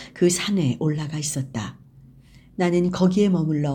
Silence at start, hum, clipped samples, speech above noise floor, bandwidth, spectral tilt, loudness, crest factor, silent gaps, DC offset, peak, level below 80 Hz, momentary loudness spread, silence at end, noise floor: 0 s; none; under 0.1%; 28 dB; 19 kHz; -5.5 dB/octave; -22 LUFS; 16 dB; none; under 0.1%; -6 dBFS; -54 dBFS; 11 LU; 0 s; -49 dBFS